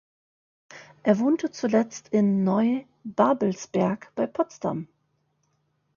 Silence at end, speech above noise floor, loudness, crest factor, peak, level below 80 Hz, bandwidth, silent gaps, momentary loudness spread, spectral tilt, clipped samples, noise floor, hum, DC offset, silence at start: 1.1 s; 48 dB; -25 LUFS; 20 dB; -6 dBFS; -68 dBFS; 7.2 kHz; none; 9 LU; -7 dB/octave; under 0.1%; -72 dBFS; none; under 0.1%; 0.7 s